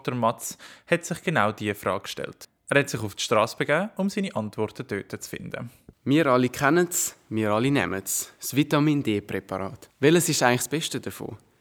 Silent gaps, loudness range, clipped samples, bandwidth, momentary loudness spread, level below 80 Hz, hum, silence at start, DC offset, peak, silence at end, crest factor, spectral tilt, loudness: none; 3 LU; under 0.1%; over 20 kHz; 14 LU; -64 dBFS; none; 0.05 s; under 0.1%; -2 dBFS; 0.25 s; 22 dB; -4.5 dB/octave; -25 LUFS